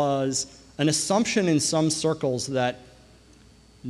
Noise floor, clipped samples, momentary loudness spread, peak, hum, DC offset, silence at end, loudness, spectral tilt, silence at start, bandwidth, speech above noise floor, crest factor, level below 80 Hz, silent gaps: -53 dBFS; under 0.1%; 7 LU; -10 dBFS; none; under 0.1%; 0 s; -24 LUFS; -4 dB/octave; 0 s; 13 kHz; 29 dB; 16 dB; -58 dBFS; none